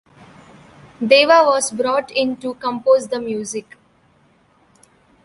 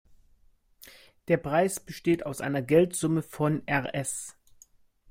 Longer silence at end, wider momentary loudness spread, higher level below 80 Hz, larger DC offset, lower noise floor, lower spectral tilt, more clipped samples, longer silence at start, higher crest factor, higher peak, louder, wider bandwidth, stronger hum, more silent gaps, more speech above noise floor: first, 1.65 s vs 0.8 s; first, 14 LU vs 10 LU; about the same, -62 dBFS vs -60 dBFS; neither; second, -56 dBFS vs -62 dBFS; second, -2.5 dB/octave vs -5.5 dB/octave; neither; first, 1 s vs 0.85 s; about the same, 18 dB vs 20 dB; first, 0 dBFS vs -8 dBFS; first, -17 LUFS vs -28 LUFS; second, 11.5 kHz vs 16.5 kHz; neither; neither; first, 39 dB vs 35 dB